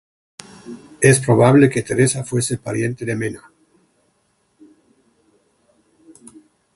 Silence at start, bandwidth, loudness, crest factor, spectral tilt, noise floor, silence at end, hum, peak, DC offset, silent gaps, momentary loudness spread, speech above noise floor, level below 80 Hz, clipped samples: 0.65 s; 11.5 kHz; -17 LUFS; 20 dB; -5.5 dB/octave; -65 dBFS; 3.4 s; none; 0 dBFS; under 0.1%; none; 26 LU; 49 dB; -54 dBFS; under 0.1%